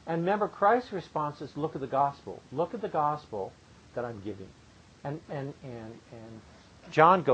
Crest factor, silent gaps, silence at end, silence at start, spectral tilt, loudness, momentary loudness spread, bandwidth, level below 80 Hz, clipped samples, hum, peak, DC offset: 24 dB; none; 0 s; 0.05 s; -7 dB/octave; -30 LUFS; 21 LU; 9 kHz; -64 dBFS; under 0.1%; none; -6 dBFS; under 0.1%